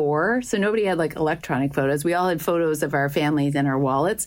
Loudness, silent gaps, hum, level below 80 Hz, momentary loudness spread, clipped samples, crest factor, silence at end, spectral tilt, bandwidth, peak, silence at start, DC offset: -22 LUFS; none; none; -52 dBFS; 2 LU; under 0.1%; 12 dB; 0 s; -5.5 dB/octave; 16.5 kHz; -10 dBFS; 0 s; under 0.1%